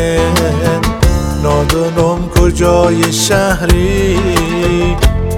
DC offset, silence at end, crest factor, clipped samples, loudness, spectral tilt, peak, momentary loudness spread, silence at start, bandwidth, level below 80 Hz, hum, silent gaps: under 0.1%; 0 s; 10 dB; 0.5%; -12 LUFS; -5 dB/octave; 0 dBFS; 3 LU; 0 s; 17 kHz; -18 dBFS; none; none